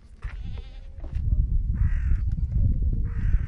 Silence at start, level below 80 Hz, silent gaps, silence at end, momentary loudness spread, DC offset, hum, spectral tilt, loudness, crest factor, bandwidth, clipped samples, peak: 0.05 s; -26 dBFS; none; 0 s; 15 LU; under 0.1%; none; -9.5 dB/octave; -28 LUFS; 16 dB; 3.9 kHz; under 0.1%; -8 dBFS